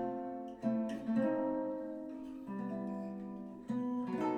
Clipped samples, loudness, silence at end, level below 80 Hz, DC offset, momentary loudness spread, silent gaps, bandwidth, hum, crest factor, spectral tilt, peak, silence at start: under 0.1%; -39 LUFS; 0 s; -72 dBFS; under 0.1%; 11 LU; none; 8.8 kHz; none; 16 dB; -8.5 dB/octave; -22 dBFS; 0 s